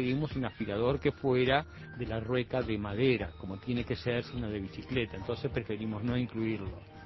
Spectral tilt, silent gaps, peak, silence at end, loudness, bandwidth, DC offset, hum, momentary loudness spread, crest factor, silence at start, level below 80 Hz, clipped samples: -5.5 dB/octave; none; -12 dBFS; 0 s; -33 LUFS; 6 kHz; under 0.1%; none; 9 LU; 22 dB; 0 s; -50 dBFS; under 0.1%